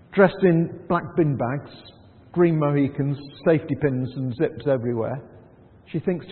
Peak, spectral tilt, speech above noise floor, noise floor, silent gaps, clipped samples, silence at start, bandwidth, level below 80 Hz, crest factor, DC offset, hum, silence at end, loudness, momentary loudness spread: -4 dBFS; -12.5 dB/octave; 28 dB; -50 dBFS; none; under 0.1%; 0.1 s; 4.4 kHz; -58 dBFS; 20 dB; under 0.1%; none; 0 s; -23 LUFS; 10 LU